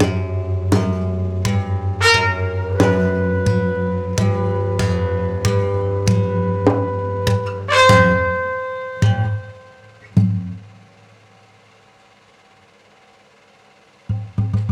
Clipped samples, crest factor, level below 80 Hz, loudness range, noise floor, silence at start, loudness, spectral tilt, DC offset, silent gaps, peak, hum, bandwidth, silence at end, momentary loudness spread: under 0.1%; 16 dB; -44 dBFS; 10 LU; -51 dBFS; 0 s; -18 LUFS; -6 dB/octave; under 0.1%; none; -2 dBFS; none; 13.5 kHz; 0 s; 10 LU